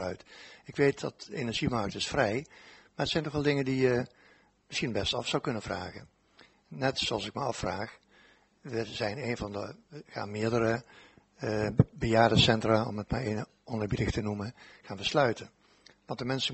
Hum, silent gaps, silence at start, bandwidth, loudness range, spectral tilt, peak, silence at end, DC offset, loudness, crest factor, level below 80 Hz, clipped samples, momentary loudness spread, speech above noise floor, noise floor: none; none; 0 s; 8.2 kHz; 7 LU; -5.5 dB/octave; -8 dBFS; 0 s; under 0.1%; -31 LUFS; 24 dB; -52 dBFS; under 0.1%; 16 LU; 32 dB; -63 dBFS